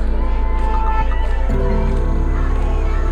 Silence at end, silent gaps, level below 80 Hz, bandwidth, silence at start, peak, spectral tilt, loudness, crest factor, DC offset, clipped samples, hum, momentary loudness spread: 0 s; none; -16 dBFS; 4.7 kHz; 0 s; -6 dBFS; -8 dB/octave; -20 LUFS; 10 dB; under 0.1%; under 0.1%; none; 2 LU